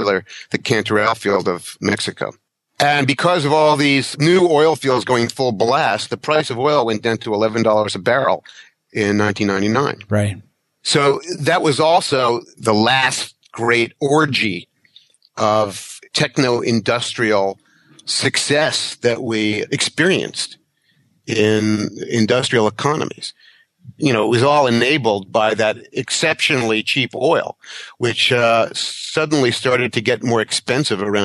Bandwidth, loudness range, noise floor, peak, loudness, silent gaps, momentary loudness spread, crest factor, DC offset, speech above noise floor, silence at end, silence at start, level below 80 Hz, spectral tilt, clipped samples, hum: 12.5 kHz; 3 LU; -61 dBFS; -2 dBFS; -17 LUFS; none; 9 LU; 16 dB; under 0.1%; 44 dB; 0 s; 0 s; -60 dBFS; -4 dB/octave; under 0.1%; none